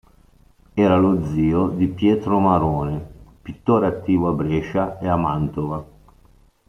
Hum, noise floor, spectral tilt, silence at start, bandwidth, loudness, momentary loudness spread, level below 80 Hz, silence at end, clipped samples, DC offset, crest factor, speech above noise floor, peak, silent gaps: none; -53 dBFS; -9.5 dB/octave; 0.75 s; 6.8 kHz; -20 LUFS; 11 LU; -44 dBFS; 0.85 s; under 0.1%; under 0.1%; 16 dB; 34 dB; -4 dBFS; none